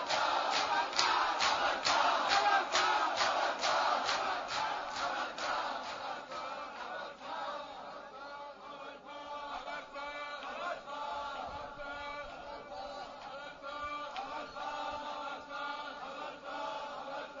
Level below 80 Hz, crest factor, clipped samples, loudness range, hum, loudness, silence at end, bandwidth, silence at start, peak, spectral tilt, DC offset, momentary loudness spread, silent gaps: -68 dBFS; 24 dB; under 0.1%; 14 LU; none; -35 LUFS; 0 s; 7.4 kHz; 0 s; -12 dBFS; 1.5 dB/octave; under 0.1%; 16 LU; none